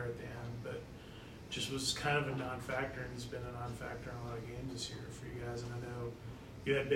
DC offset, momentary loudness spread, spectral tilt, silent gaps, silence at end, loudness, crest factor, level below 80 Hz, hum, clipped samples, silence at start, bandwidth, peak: under 0.1%; 12 LU; -4.5 dB/octave; none; 0 s; -41 LUFS; 20 dB; -58 dBFS; none; under 0.1%; 0 s; 16 kHz; -20 dBFS